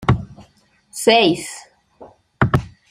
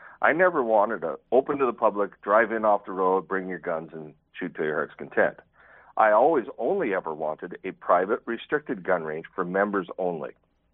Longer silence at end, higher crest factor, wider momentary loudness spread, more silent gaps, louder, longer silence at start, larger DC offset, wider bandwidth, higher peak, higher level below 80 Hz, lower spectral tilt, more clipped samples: second, 0.2 s vs 0.45 s; about the same, 20 dB vs 20 dB; first, 22 LU vs 14 LU; neither; first, -17 LUFS vs -25 LUFS; about the same, 0 s vs 0 s; neither; first, 15.5 kHz vs 4 kHz; first, 0 dBFS vs -4 dBFS; first, -40 dBFS vs -68 dBFS; about the same, -5 dB/octave vs -4.5 dB/octave; neither